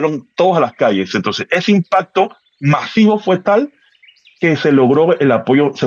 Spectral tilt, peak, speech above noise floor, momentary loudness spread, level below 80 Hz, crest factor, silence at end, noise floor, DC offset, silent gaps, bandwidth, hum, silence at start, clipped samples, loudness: -7 dB/octave; -2 dBFS; 35 dB; 6 LU; -62 dBFS; 12 dB; 0 s; -48 dBFS; under 0.1%; none; 7.2 kHz; none; 0 s; under 0.1%; -14 LUFS